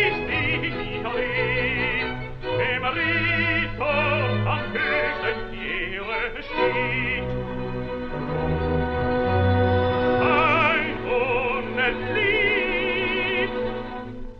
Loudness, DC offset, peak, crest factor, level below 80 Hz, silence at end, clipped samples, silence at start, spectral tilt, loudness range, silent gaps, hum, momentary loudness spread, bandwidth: -23 LUFS; under 0.1%; -8 dBFS; 16 dB; -38 dBFS; 0 s; under 0.1%; 0 s; -8 dB/octave; 4 LU; none; none; 10 LU; 6.4 kHz